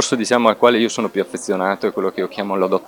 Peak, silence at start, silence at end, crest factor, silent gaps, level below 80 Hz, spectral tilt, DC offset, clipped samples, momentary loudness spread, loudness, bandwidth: 0 dBFS; 0 s; 0 s; 18 dB; none; -68 dBFS; -4 dB/octave; under 0.1%; under 0.1%; 9 LU; -18 LUFS; 18 kHz